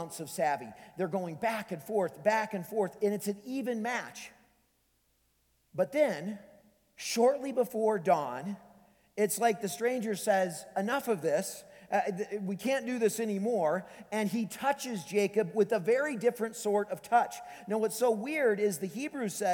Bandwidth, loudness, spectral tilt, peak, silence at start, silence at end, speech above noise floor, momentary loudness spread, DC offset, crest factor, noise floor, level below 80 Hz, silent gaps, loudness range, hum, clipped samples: 19.5 kHz; -32 LUFS; -4.5 dB/octave; -14 dBFS; 0 s; 0 s; 42 dB; 9 LU; under 0.1%; 18 dB; -73 dBFS; -78 dBFS; none; 5 LU; none; under 0.1%